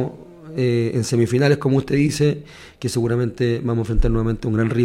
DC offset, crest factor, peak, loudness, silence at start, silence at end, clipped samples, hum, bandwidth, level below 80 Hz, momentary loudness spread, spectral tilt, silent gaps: under 0.1%; 14 dB; -4 dBFS; -20 LUFS; 0 s; 0 s; under 0.1%; none; 15 kHz; -30 dBFS; 10 LU; -6.5 dB/octave; none